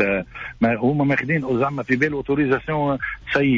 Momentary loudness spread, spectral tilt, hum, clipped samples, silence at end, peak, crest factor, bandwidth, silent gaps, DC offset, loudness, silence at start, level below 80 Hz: 4 LU; -8 dB/octave; none; under 0.1%; 0 s; -8 dBFS; 14 dB; 7.6 kHz; none; under 0.1%; -21 LUFS; 0 s; -46 dBFS